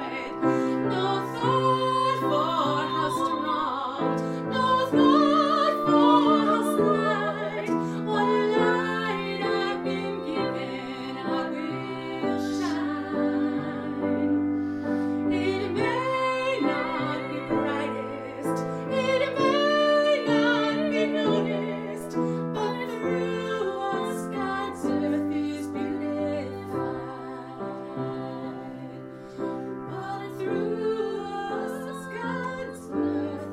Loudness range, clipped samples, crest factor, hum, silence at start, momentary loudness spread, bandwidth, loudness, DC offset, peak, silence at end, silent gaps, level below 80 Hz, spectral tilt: 10 LU; under 0.1%; 20 dB; none; 0 s; 11 LU; 13.5 kHz; -26 LUFS; under 0.1%; -6 dBFS; 0 s; none; -64 dBFS; -6 dB/octave